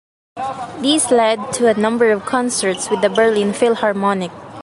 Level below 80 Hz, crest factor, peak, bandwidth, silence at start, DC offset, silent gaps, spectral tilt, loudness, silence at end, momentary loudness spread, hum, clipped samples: -56 dBFS; 14 dB; -2 dBFS; 11.5 kHz; 0.35 s; under 0.1%; none; -3.5 dB/octave; -16 LUFS; 0 s; 11 LU; none; under 0.1%